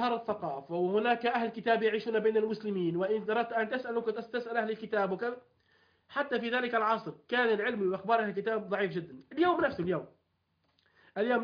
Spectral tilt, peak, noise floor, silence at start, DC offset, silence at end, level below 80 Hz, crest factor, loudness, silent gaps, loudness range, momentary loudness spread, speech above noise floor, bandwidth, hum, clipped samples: -7.5 dB/octave; -14 dBFS; -77 dBFS; 0 s; under 0.1%; 0 s; -72 dBFS; 18 dB; -31 LUFS; none; 3 LU; 8 LU; 45 dB; 5.2 kHz; none; under 0.1%